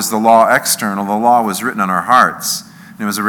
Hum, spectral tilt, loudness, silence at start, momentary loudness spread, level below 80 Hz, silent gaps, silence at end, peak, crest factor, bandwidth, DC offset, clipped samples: none; -3 dB/octave; -13 LUFS; 0 s; 10 LU; -62 dBFS; none; 0 s; 0 dBFS; 14 dB; over 20 kHz; under 0.1%; 0.3%